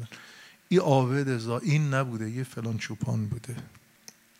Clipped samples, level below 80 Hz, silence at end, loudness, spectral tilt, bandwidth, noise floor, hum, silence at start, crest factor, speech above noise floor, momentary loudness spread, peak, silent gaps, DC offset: under 0.1%; -68 dBFS; 0.6 s; -28 LUFS; -6.5 dB/octave; 15.5 kHz; -54 dBFS; none; 0 s; 20 dB; 27 dB; 18 LU; -8 dBFS; none; under 0.1%